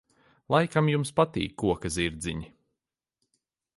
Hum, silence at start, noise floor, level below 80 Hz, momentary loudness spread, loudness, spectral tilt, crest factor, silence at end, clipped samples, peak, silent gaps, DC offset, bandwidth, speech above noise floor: none; 0.5 s; -87 dBFS; -50 dBFS; 10 LU; -27 LUFS; -5.5 dB/octave; 22 dB; 1.3 s; under 0.1%; -8 dBFS; none; under 0.1%; 11.5 kHz; 61 dB